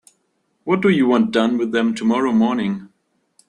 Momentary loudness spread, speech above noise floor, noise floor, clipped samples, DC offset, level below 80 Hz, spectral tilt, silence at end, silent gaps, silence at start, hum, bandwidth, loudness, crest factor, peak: 9 LU; 51 dB; -68 dBFS; under 0.1%; under 0.1%; -60 dBFS; -6.5 dB/octave; 0.65 s; none; 0.65 s; none; 10.5 kHz; -18 LUFS; 16 dB; -4 dBFS